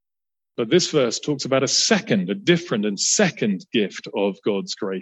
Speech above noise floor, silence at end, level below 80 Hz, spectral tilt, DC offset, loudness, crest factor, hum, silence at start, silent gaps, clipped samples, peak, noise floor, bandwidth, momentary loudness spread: over 69 dB; 0 s; -68 dBFS; -3.5 dB/octave; under 0.1%; -21 LUFS; 18 dB; none; 0.6 s; none; under 0.1%; -4 dBFS; under -90 dBFS; 8.6 kHz; 8 LU